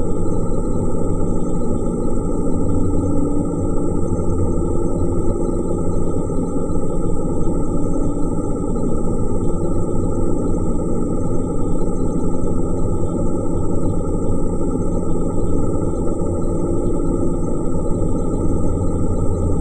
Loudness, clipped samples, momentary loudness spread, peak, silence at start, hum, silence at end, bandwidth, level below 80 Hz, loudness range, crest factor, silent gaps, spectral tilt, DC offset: -21 LUFS; under 0.1%; 2 LU; -4 dBFS; 0 s; none; 0 s; 9 kHz; -22 dBFS; 1 LU; 12 dB; none; -9.5 dB/octave; under 0.1%